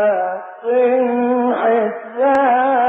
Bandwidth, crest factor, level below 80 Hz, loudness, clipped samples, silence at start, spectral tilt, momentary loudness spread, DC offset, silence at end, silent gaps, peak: 4.1 kHz; 12 dB; -66 dBFS; -16 LUFS; under 0.1%; 0 s; -7 dB/octave; 8 LU; under 0.1%; 0 s; none; -4 dBFS